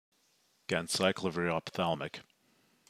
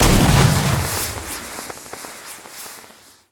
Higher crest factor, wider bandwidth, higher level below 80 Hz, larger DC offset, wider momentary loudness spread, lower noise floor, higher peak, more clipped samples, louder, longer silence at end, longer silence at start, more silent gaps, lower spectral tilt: first, 24 dB vs 18 dB; second, 15.5 kHz vs 19.5 kHz; second, -72 dBFS vs -28 dBFS; neither; second, 14 LU vs 21 LU; first, -72 dBFS vs -46 dBFS; second, -12 dBFS vs -2 dBFS; neither; second, -33 LUFS vs -18 LUFS; first, 0.65 s vs 0.5 s; first, 0.7 s vs 0 s; neither; about the same, -4 dB/octave vs -4.5 dB/octave